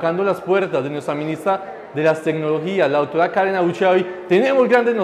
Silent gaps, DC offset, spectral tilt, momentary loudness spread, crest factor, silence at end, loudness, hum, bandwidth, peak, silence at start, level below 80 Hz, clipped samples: none; under 0.1%; -6.5 dB/octave; 8 LU; 12 dB; 0 s; -18 LUFS; none; 13.5 kHz; -6 dBFS; 0 s; -66 dBFS; under 0.1%